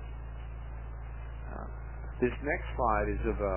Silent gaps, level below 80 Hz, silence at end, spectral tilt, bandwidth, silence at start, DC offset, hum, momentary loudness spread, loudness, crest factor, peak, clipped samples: none; -40 dBFS; 0 s; -6.5 dB/octave; 3.2 kHz; 0 s; 0.2%; none; 14 LU; -35 LUFS; 20 dB; -16 dBFS; under 0.1%